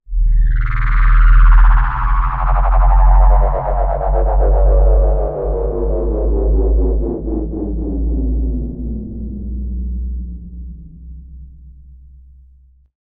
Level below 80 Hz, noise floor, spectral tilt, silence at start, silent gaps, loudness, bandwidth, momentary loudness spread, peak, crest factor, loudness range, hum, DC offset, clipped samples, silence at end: -14 dBFS; -47 dBFS; -11.5 dB/octave; 0.1 s; none; -17 LUFS; 2.9 kHz; 14 LU; -2 dBFS; 12 dB; 14 LU; none; under 0.1%; under 0.1%; 1.45 s